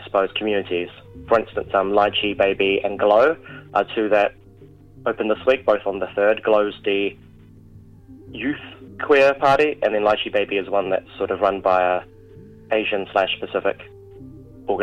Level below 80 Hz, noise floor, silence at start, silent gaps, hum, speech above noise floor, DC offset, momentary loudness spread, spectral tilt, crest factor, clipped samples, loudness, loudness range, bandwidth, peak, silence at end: -52 dBFS; -46 dBFS; 0 s; none; none; 26 dB; under 0.1%; 10 LU; -6 dB/octave; 18 dB; under 0.1%; -20 LUFS; 3 LU; 8.4 kHz; -2 dBFS; 0 s